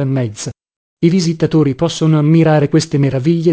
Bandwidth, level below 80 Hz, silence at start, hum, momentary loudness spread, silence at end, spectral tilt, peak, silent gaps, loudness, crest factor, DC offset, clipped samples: 8 kHz; -48 dBFS; 0 s; none; 8 LU; 0 s; -7 dB/octave; 0 dBFS; 0.76-0.97 s; -13 LUFS; 14 dB; 0.2%; under 0.1%